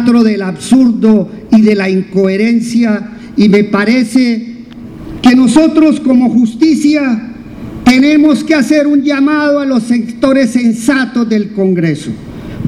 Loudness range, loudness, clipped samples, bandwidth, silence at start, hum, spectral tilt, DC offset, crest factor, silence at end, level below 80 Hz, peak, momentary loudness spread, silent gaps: 2 LU; -10 LUFS; 0.7%; 12.5 kHz; 0 s; none; -6 dB/octave; under 0.1%; 10 dB; 0 s; -40 dBFS; 0 dBFS; 12 LU; none